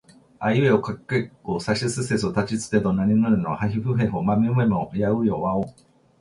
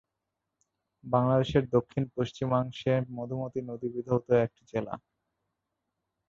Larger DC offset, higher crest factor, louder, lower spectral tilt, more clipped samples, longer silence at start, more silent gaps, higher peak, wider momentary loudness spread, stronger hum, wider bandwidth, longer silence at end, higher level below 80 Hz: neither; about the same, 16 dB vs 20 dB; first, -23 LUFS vs -30 LUFS; second, -6.5 dB/octave vs -8 dB/octave; neither; second, 0.4 s vs 1.05 s; neither; first, -6 dBFS vs -10 dBFS; second, 7 LU vs 10 LU; neither; first, 11.5 kHz vs 7.4 kHz; second, 0.5 s vs 1.3 s; first, -50 dBFS vs -58 dBFS